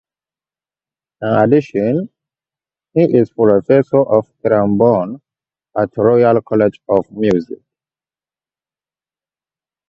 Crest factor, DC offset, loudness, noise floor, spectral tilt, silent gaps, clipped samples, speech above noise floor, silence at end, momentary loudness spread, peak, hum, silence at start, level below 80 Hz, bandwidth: 16 dB; under 0.1%; -14 LUFS; under -90 dBFS; -9.5 dB/octave; none; under 0.1%; over 77 dB; 2.35 s; 13 LU; 0 dBFS; none; 1.2 s; -54 dBFS; 6.8 kHz